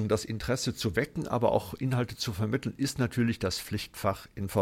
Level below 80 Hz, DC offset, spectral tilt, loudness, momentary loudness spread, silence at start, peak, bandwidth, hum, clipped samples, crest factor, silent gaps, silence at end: -52 dBFS; under 0.1%; -5.5 dB/octave; -31 LUFS; 4 LU; 0 s; -12 dBFS; 16.5 kHz; none; under 0.1%; 18 dB; none; 0 s